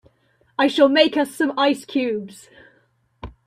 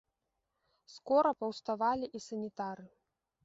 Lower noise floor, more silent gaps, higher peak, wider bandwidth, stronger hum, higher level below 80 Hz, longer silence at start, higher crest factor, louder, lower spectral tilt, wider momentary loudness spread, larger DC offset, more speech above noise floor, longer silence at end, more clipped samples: second, -62 dBFS vs -85 dBFS; neither; first, -2 dBFS vs -16 dBFS; first, 14.5 kHz vs 7.6 kHz; neither; first, -52 dBFS vs -74 dBFS; second, 0.6 s vs 0.9 s; about the same, 20 dB vs 20 dB; first, -19 LUFS vs -34 LUFS; about the same, -4 dB/octave vs -4 dB/octave; first, 23 LU vs 13 LU; neither; second, 43 dB vs 51 dB; second, 0.15 s vs 0.55 s; neither